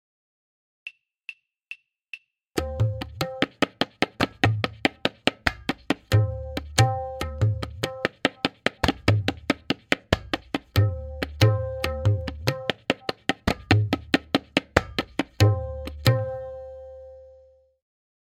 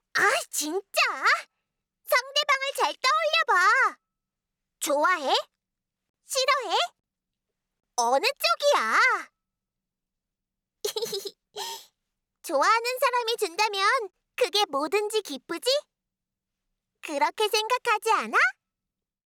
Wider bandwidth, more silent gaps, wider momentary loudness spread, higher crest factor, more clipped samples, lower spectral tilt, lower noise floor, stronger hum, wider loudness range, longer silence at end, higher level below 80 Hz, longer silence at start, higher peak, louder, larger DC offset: second, 16 kHz vs over 20 kHz; second, none vs 6.09-6.14 s; first, 20 LU vs 12 LU; first, 26 dB vs 14 dB; neither; first, -5.5 dB/octave vs 0.5 dB/octave; second, -55 dBFS vs -88 dBFS; neither; about the same, 3 LU vs 5 LU; first, 0.95 s vs 0.75 s; first, -44 dBFS vs -82 dBFS; first, 0.85 s vs 0.15 s; first, 0 dBFS vs -12 dBFS; about the same, -26 LUFS vs -24 LUFS; neither